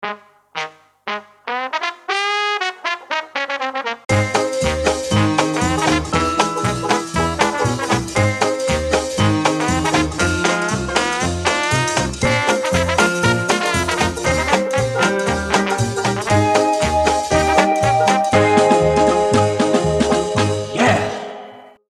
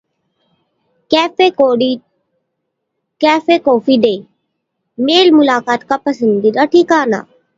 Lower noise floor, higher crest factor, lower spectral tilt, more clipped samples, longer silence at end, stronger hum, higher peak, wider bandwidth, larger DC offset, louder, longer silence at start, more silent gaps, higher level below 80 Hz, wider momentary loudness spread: second, -38 dBFS vs -72 dBFS; about the same, 18 dB vs 14 dB; about the same, -4.5 dB/octave vs -5 dB/octave; neither; about the same, 0.25 s vs 0.35 s; neither; about the same, 0 dBFS vs 0 dBFS; first, 13.5 kHz vs 7.8 kHz; neither; second, -17 LUFS vs -12 LUFS; second, 0 s vs 1.1 s; neither; first, -36 dBFS vs -60 dBFS; about the same, 8 LU vs 8 LU